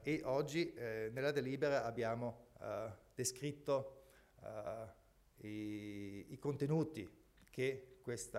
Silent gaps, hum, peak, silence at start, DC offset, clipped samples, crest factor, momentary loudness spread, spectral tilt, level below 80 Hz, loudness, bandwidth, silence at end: none; none; -26 dBFS; 0 s; under 0.1%; under 0.1%; 18 dB; 13 LU; -5 dB/octave; -72 dBFS; -42 LUFS; 16 kHz; 0 s